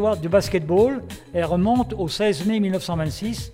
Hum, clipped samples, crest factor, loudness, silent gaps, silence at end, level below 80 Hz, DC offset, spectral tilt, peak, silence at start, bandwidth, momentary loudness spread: none; under 0.1%; 14 dB; -22 LUFS; none; 0 s; -42 dBFS; under 0.1%; -6 dB/octave; -6 dBFS; 0 s; 16.5 kHz; 7 LU